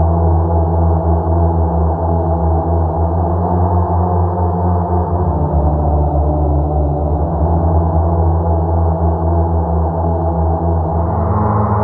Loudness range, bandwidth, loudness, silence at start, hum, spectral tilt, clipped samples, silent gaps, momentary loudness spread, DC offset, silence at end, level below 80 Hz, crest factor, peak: 1 LU; 2 kHz; -15 LUFS; 0 s; none; -14 dB/octave; under 0.1%; none; 2 LU; under 0.1%; 0 s; -20 dBFS; 12 dB; -2 dBFS